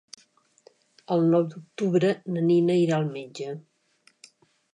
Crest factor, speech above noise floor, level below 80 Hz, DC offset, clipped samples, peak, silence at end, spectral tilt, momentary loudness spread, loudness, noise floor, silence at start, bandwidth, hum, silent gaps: 16 dB; 40 dB; -78 dBFS; under 0.1%; under 0.1%; -10 dBFS; 1.15 s; -7.5 dB/octave; 14 LU; -25 LUFS; -64 dBFS; 1.1 s; 10 kHz; none; none